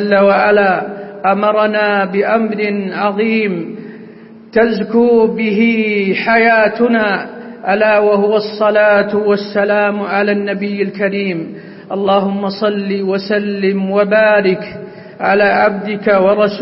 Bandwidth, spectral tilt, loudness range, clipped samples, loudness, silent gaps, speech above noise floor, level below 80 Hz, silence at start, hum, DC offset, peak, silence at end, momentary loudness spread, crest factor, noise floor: 5.8 kHz; -10.5 dB/octave; 4 LU; under 0.1%; -13 LUFS; none; 23 dB; -54 dBFS; 0 s; none; under 0.1%; 0 dBFS; 0 s; 10 LU; 14 dB; -36 dBFS